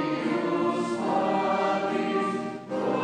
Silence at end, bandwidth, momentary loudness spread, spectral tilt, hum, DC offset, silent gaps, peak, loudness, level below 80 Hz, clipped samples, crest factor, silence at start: 0 s; 10 kHz; 5 LU; -6 dB/octave; none; under 0.1%; none; -14 dBFS; -27 LUFS; -78 dBFS; under 0.1%; 12 dB; 0 s